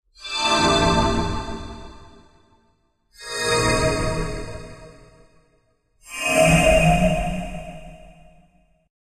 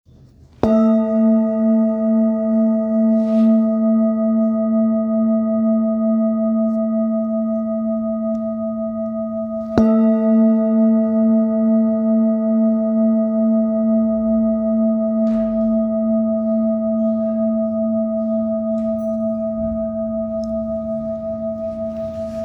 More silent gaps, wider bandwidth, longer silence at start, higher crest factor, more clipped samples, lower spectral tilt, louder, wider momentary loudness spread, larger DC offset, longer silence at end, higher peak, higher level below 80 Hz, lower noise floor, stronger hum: neither; first, 14.5 kHz vs 2.1 kHz; second, 0.2 s vs 0.65 s; about the same, 18 dB vs 18 dB; neither; second, -4.5 dB/octave vs -11 dB/octave; about the same, -20 LUFS vs -18 LUFS; first, 23 LU vs 8 LU; neither; first, 0.95 s vs 0 s; second, -4 dBFS vs 0 dBFS; first, -34 dBFS vs -48 dBFS; first, -64 dBFS vs -46 dBFS; neither